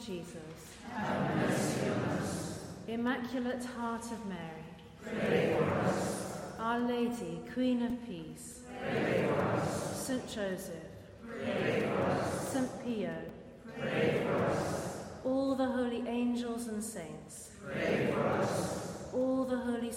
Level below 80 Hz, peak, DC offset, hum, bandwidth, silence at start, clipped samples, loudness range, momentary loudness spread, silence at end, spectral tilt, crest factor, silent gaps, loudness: -62 dBFS; -18 dBFS; under 0.1%; none; 16 kHz; 0 s; under 0.1%; 2 LU; 14 LU; 0 s; -5.5 dB/octave; 18 dB; none; -35 LUFS